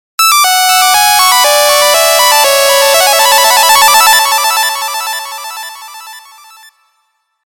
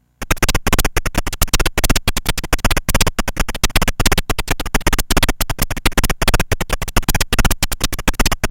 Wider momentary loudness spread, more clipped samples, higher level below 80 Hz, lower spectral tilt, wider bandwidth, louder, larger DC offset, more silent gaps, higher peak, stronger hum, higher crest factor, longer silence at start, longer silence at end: first, 16 LU vs 4 LU; first, 0.3% vs under 0.1%; second, -52 dBFS vs -20 dBFS; second, 3 dB/octave vs -3 dB/octave; about the same, 19 kHz vs 17.5 kHz; first, -6 LUFS vs -18 LUFS; neither; neither; about the same, 0 dBFS vs 0 dBFS; neither; second, 10 dB vs 16 dB; about the same, 0.2 s vs 0.2 s; first, 1.3 s vs 0 s